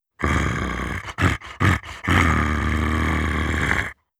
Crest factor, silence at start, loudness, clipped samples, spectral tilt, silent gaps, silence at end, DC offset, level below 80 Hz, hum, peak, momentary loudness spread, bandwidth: 18 dB; 0.2 s; -22 LUFS; under 0.1%; -5.5 dB/octave; none; 0.25 s; under 0.1%; -30 dBFS; none; -4 dBFS; 6 LU; 14 kHz